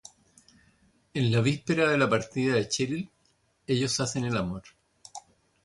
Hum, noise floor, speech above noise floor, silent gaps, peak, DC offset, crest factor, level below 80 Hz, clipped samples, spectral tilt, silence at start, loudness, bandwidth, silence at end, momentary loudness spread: none; -69 dBFS; 42 dB; none; -10 dBFS; under 0.1%; 18 dB; -58 dBFS; under 0.1%; -5 dB/octave; 1.15 s; -27 LUFS; 11.5 kHz; 0.45 s; 21 LU